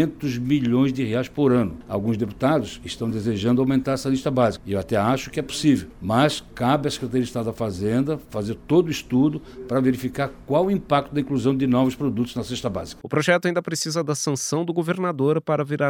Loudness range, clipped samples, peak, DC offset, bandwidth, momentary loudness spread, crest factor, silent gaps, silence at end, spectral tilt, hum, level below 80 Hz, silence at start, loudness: 1 LU; under 0.1%; -4 dBFS; 0.1%; 17.5 kHz; 7 LU; 18 dB; none; 0 s; -6 dB/octave; none; -48 dBFS; 0 s; -23 LUFS